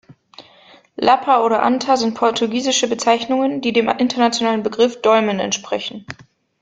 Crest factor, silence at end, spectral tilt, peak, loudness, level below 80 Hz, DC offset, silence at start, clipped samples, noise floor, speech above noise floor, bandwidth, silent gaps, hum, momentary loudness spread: 16 dB; 0.4 s; -3 dB/octave; -2 dBFS; -17 LUFS; -60 dBFS; under 0.1%; 0.1 s; under 0.1%; -48 dBFS; 31 dB; 9.4 kHz; none; none; 10 LU